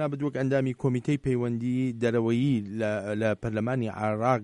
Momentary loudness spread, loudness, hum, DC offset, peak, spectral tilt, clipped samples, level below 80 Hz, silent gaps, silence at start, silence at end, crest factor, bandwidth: 4 LU; -28 LUFS; none; under 0.1%; -12 dBFS; -8 dB/octave; under 0.1%; -56 dBFS; none; 0 s; 0 s; 16 dB; 10.5 kHz